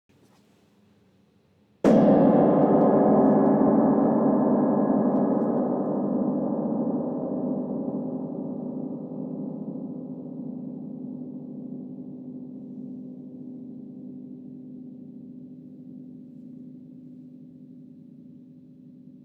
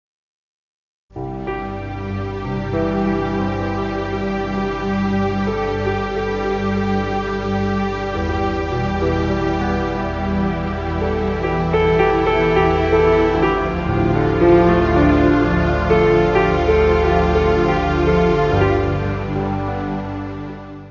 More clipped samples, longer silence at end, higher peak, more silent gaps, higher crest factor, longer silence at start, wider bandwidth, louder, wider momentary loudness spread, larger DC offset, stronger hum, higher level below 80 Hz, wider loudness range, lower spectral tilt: neither; about the same, 0.05 s vs 0 s; second, -8 dBFS vs 0 dBFS; neither; about the same, 18 dB vs 16 dB; first, 1.85 s vs 1.15 s; about the same, 7 kHz vs 7.4 kHz; second, -23 LUFS vs -18 LUFS; first, 24 LU vs 11 LU; neither; neither; second, -64 dBFS vs -28 dBFS; first, 24 LU vs 7 LU; first, -10.5 dB/octave vs -8 dB/octave